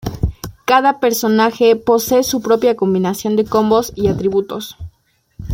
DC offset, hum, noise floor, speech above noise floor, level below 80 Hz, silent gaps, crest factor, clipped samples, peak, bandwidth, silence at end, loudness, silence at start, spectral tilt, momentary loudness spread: under 0.1%; none; -42 dBFS; 27 dB; -36 dBFS; none; 14 dB; under 0.1%; -2 dBFS; 17 kHz; 0 s; -15 LUFS; 0.05 s; -5 dB/octave; 13 LU